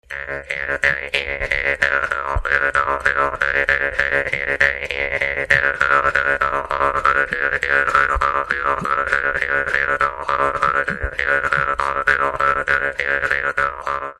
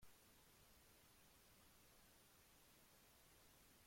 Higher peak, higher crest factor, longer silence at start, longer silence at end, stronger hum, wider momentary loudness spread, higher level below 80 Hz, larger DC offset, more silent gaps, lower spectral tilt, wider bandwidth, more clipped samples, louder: first, 0 dBFS vs -54 dBFS; about the same, 20 dB vs 16 dB; about the same, 0.1 s vs 0 s; about the same, 0.05 s vs 0 s; neither; first, 5 LU vs 0 LU; first, -36 dBFS vs -80 dBFS; neither; neither; first, -4 dB/octave vs -2.5 dB/octave; second, 12 kHz vs 16.5 kHz; neither; first, -18 LUFS vs -70 LUFS